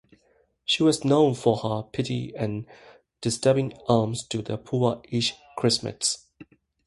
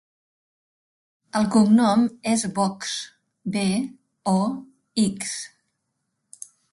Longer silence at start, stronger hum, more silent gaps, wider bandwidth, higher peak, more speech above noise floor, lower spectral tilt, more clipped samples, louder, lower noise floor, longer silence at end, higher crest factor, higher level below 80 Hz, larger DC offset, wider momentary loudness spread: second, 0.7 s vs 1.35 s; neither; neither; about the same, 11.5 kHz vs 11.5 kHz; about the same, -6 dBFS vs -6 dBFS; second, 41 dB vs 55 dB; about the same, -5 dB/octave vs -5 dB/octave; neither; about the same, -25 LUFS vs -23 LUFS; second, -65 dBFS vs -77 dBFS; second, 0.45 s vs 1.25 s; about the same, 20 dB vs 18 dB; first, -58 dBFS vs -64 dBFS; neither; second, 10 LU vs 21 LU